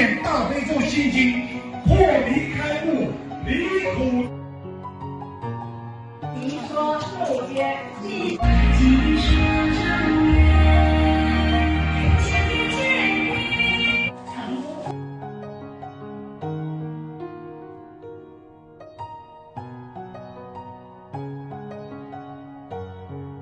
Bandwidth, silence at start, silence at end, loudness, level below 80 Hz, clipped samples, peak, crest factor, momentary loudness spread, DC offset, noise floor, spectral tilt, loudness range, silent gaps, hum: 10 kHz; 0 s; 0 s; -21 LUFS; -28 dBFS; under 0.1%; -4 dBFS; 18 dB; 21 LU; under 0.1%; -46 dBFS; -6.5 dB/octave; 19 LU; none; none